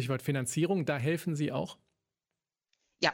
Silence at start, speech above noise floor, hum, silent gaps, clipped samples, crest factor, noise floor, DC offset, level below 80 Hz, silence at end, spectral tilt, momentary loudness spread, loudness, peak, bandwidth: 0 s; over 58 dB; none; none; under 0.1%; 22 dB; under -90 dBFS; under 0.1%; -70 dBFS; 0 s; -5 dB/octave; 5 LU; -32 LUFS; -12 dBFS; 17 kHz